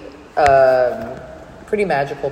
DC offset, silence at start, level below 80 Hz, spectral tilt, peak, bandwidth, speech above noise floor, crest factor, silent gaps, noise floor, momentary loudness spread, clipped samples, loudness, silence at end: under 0.1%; 0 s; -44 dBFS; -5.5 dB/octave; 0 dBFS; 10 kHz; 21 dB; 18 dB; none; -37 dBFS; 19 LU; under 0.1%; -16 LUFS; 0 s